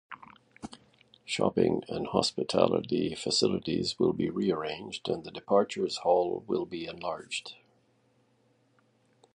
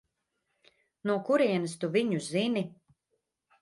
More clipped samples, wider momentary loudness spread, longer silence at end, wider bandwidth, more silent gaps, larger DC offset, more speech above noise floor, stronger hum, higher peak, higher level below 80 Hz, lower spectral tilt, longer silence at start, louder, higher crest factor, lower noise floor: neither; first, 19 LU vs 8 LU; first, 1.8 s vs 0.9 s; about the same, 11 kHz vs 11.5 kHz; neither; neither; second, 39 dB vs 52 dB; neither; first, -8 dBFS vs -14 dBFS; first, -62 dBFS vs -78 dBFS; about the same, -4.5 dB/octave vs -5.5 dB/octave; second, 0.1 s vs 1.05 s; about the same, -30 LUFS vs -29 LUFS; first, 24 dB vs 18 dB; second, -69 dBFS vs -81 dBFS